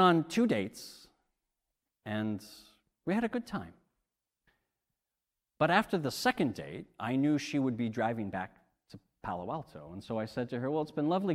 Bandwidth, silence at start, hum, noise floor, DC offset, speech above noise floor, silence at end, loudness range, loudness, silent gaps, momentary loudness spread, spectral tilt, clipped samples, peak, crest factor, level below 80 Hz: 15.5 kHz; 0 s; none; -89 dBFS; under 0.1%; 57 dB; 0 s; 7 LU; -33 LUFS; none; 16 LU; -6 dB/octave; under 0.1%; -12 dBFS; 22 dB; -68 dBFS